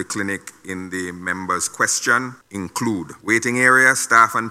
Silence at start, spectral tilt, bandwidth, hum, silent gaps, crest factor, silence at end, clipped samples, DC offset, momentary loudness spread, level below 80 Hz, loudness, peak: 0 s; -3 dB/octave; 16 kHz; none; none; 20 dB; 0 s; under 0.1%; under 0.1%; 16 LU; -62 dBFS; -18 LUFS; 0 dBFS